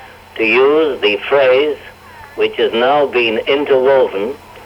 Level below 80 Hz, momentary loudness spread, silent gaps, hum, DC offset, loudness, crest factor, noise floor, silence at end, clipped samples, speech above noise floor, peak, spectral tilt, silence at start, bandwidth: -52 dBFS; 11 LU; none; none; under 0.1%; -13 LUFS; 12 dB; -36 dBFS; 0 s; under 0.1%; 23 dB; -2 dBFS; -5 dB/octave; 0 s; 10 kHz